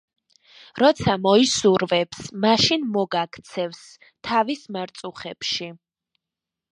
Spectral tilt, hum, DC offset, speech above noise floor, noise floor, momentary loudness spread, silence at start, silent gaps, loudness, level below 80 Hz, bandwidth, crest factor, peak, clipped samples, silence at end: -4 dB/octave; none; under 0.1%; 65 dB; -87 dBFS; 16 LU; 0.75 s; none; -21 LUFS; -56 dBFS; 11 kHz; 20 dB; -4 dBFS; under 0.1%; 0.95 s